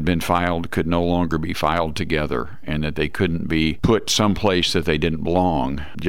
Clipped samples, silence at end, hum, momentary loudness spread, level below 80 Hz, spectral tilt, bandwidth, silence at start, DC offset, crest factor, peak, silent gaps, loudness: under 0.1%; 0 s; none; 6 LU; -36 dBFS; -5 dB/octave; 16.5 kHz; 0 s; 3%; 16 dB; -6 dBFS; none; -21 LUFS